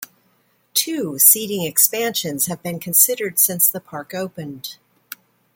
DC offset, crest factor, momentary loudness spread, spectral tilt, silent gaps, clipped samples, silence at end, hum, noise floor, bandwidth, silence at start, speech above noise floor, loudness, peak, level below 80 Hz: under 0.1%; 20 dB; 21 LU; -2 dB/octave; none; under 0.1%; 0.4 s; none; -62 dBFS; 17 kHz; 0 s; 42 dB; -16 LUFS; 0 dBFS; -68 dBFS